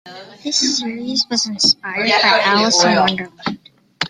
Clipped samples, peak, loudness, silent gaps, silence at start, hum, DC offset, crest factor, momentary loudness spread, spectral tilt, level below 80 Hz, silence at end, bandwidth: under 0.1%; 0 dBFS; -15 LUFS; none; 0.05 s; none; under 0.1%; 16 dB; 14 LU; -2 dB/octave; -60 dBFS; 0 s; 12 kHz